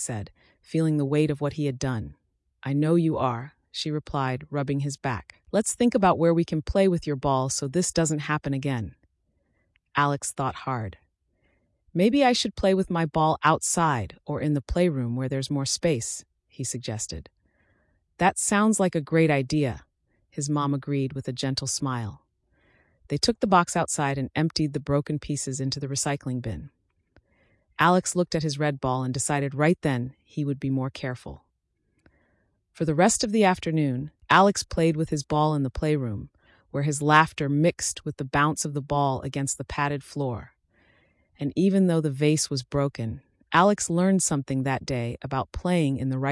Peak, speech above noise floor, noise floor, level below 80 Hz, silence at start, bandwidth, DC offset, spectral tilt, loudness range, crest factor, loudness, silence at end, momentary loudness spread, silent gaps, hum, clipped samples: -8 dBFS; 49 dB; -74 dBFS; -50 dBFS; 0 s; 12 kHz; under 0.1%; -5 dB/octave; 5 LU; 18 dB; -25 LUFS; 0 s; 12 LU; none; none; under 0.1%